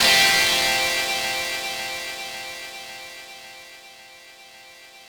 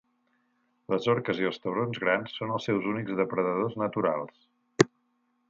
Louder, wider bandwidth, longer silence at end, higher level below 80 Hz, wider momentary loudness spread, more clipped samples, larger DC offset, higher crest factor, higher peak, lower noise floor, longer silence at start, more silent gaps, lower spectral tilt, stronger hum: first, -20 LUFS vs -29 LUFS; first, over 20 kHz vs 9.2 kHz; second, 0 s vs 0.65 s; first, -56 dBFS vs -70 dBFS; first, 25 LU vs 6 LU; neither; neither; second, 20 dB vs 26 dB; about the same, -4 dBFS vs -2 dBFS; second, -46 dBFS vs -73 dBFS; second, 0 s vs 0.9 s; neither; second, 0.5 dB/octave vs -5.5 dB/octave; neither